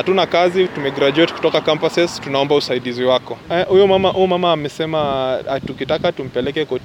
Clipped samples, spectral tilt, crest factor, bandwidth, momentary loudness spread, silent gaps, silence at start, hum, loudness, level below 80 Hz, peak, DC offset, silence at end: under 0.1%; -5.5 dB/octave; 14 dB; 11.5 kHz; 7 LU; none; 0 s; none; -17 LUFS; -50 dBFS; -2 dBFS; under 0.1%; 0 s